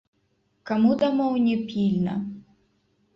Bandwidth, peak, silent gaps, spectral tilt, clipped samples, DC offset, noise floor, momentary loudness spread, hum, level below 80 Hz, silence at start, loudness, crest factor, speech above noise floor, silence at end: 6.2 kHz; -10 dBFS; none; -8.5 dB/octave; under 0.1%; under 0.1%; -69 dBFS; 12 LU; none; -62 dBFS; 0.65 s; -24 LUFS; 16 dB; 47 dB; 0.75 s